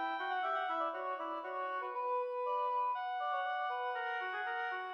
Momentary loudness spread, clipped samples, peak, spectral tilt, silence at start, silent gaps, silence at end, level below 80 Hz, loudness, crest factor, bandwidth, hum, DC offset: 4 LU; under 0.1%; -26 dBFS; -2 dB/octave; 0 s; none; 0 s; under -90 dBFS; -37 LUFS; 12 dB; 6.4 kHz; none; under 0.1%